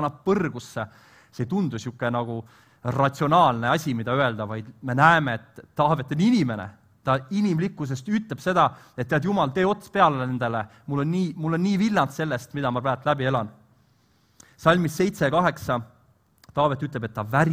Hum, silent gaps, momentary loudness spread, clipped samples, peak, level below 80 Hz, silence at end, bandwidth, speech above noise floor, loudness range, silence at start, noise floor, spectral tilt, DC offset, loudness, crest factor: none; none; 13 LU; under 0.1%; -2 dBFS; -56 dBFS; 0 s; 16 kHz; 39 dB; 3 LU; 0 s; -63 dBFS; -6.5 dB/octave; under 0.1%; -24 LUFS; 22 dB